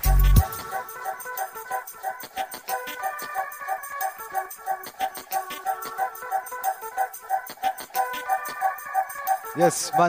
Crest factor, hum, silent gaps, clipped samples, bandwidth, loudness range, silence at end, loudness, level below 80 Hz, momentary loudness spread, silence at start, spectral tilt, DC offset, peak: 22 dB; none; none; under 0.1%; 16.5 kHz; 4 LU; 0 s; -28 LUFS; -30 dBFS; 10 LU; 0 s; -4.5 dB/octave; under 0.1%; -4 dBFS